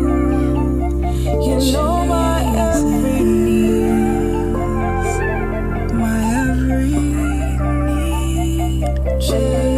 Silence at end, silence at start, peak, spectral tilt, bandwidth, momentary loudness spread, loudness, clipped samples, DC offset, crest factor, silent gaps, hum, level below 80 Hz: 0 s; 0 s; -4 dBFS; -6.5 dB/octave; 15 kHz; 4 LU; -17 LUFS; under 0.1%; under 0.1%; 12 dB; none; none; -22 dBFS